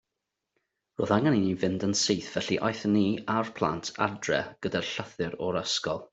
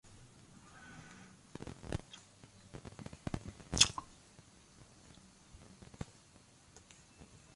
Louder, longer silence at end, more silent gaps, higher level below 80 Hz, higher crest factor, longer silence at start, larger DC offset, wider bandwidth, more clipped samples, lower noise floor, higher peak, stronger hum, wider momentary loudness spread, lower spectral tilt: first, -28 LUFS vs -37 LUFS; about the same, 0.1 s vs 0.1 s; neither; second, -64 dBFS vs -58 dBFS; second, 22 dB vs 38 dB; first, 1 s vs 0.05 s; neither; second, 8.2 kHz vs 11.5 kHz; neither; first, -85 dBFS vs -63 dBFS; about the same, -8 dBFS vs -6 dBFS; neither; second, 7 LU vs 25 LU; first, -4.5 dB/octave vs -2 dB/octave